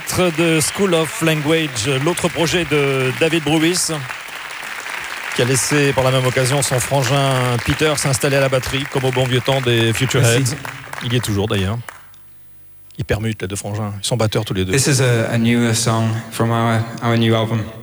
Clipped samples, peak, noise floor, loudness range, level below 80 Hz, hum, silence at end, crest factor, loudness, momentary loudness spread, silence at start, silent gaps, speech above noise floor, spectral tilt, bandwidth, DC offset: under 0.1%; -4 dBFS; -41 dBFS; 5 LU; -44 dBFS; none; 0 s; 14 dB; -17 LUFS; 10 LU; 0 s; none; 25 dB; -4.5 dB/octave; over 20 kHz; under 0.1%